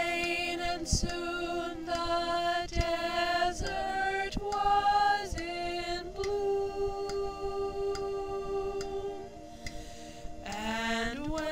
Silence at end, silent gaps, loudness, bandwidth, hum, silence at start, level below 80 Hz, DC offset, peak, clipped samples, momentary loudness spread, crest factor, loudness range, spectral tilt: 0 s; none; -32 LUFS; 16 kHz; none; 0 s; -44 dBFS; 0.2%; -14 dBFS; under 0.1%; 12 LU; 18 dB; 7 LU; -3.5 dB/octave